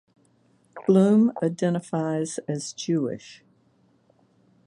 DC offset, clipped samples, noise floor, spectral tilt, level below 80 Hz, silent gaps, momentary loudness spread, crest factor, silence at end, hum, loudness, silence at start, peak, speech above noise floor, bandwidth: under 0.1%; under 0.1%; -63 dBFS; -6.5 dB/octave; -70 dBFS; none; 12 LU; 18 dB; 1.35 s; none; -24 LUFS; 0.75 s; -8 dBFS; 40 dB; 11 kHz